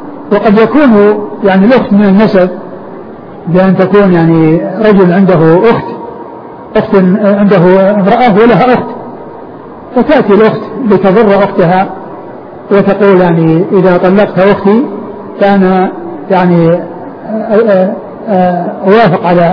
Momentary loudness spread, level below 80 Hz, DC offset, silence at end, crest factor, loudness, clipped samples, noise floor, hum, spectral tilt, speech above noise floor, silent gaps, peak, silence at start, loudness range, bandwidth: 18 LU; -40 dBFS; under 0.1%; 0 s; 8 dB; -7 LUFS; 2%; -26 dBFS; none; -10 dB/octave; 20 dB; none; 0 dBFS; 0 s; 2 LU; 5.4 kHz